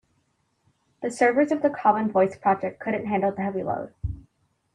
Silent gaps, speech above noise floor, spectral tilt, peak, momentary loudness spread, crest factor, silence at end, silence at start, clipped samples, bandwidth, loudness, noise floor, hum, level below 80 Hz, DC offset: none; 47 dB; -7 dB/octave; -6 dBFS; 13 LU; 18 dB; 0.55 s; 1 s; under 0.1%; 10.5 kHz; -24 LUFS; -70 dBFS; none; -48 dBFS; under 0.1%